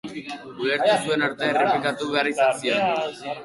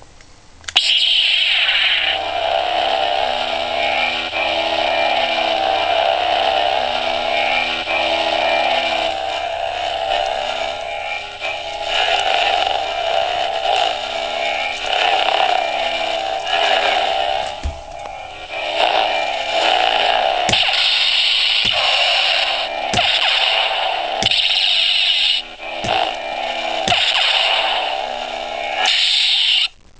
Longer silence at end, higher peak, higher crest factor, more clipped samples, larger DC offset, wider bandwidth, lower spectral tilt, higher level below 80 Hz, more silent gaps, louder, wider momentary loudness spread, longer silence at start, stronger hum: second, 0 s vs 0.3 s; second, -8 dBFS vs 0 dBFS; about the same, 16 dB vs 18 dB; neither; second, under 0.1% vs 0.3%; first, 11.5 kHz vs 8 kHz; first, -4 dB/octave vs -1 dB/octave; second, -66 dBFS vs -44 dBFS; neither; second, -22 LUFS vs -16 LUFS; about the same, 10 LU vs 10 LU; about the same, 0.05 s vs 0 s; neither